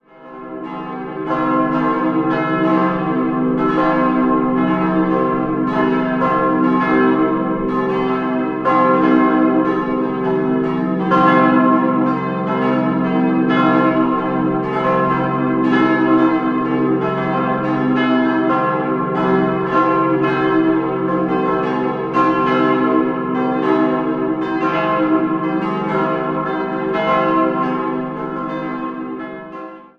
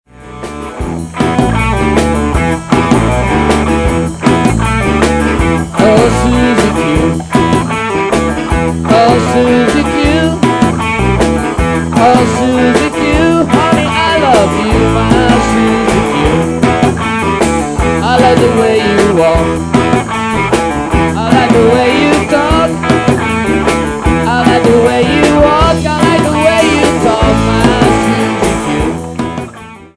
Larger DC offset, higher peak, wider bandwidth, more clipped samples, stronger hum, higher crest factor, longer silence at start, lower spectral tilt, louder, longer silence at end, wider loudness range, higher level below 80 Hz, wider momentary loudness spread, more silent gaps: neither; about the same, -2 dBFS vs 0 dBFS; second, 6 kHz vs 11 kHz; second, under 0.1% vs 0.9%; neither; first, 16 dB vs 10 dB; about the same, 0.2 s vs 0.2 s; first, -8.5 dB/octave vs -5.5 dB/octave; second, -17 LUFS vs -10 LUFS; about the same, 0.15 s vs 0.1 s; about the same, 3 LU vs 2 LU; second, -50 dBFS vs -22 dBFS; about the same, 7 LU vs 5 LU; neither